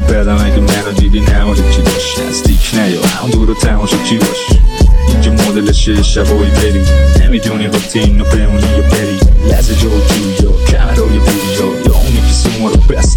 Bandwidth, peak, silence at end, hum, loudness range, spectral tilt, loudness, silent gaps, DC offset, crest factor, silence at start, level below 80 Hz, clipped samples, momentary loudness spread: 18.5 kHz; 0 dBFS; 0 s; none; 1 LU; -5.5 dB/octave; -11 LUFS; none; under 0.1%; 8 dB; 0 s; -10 dBFS; under 0.1%; 3 LU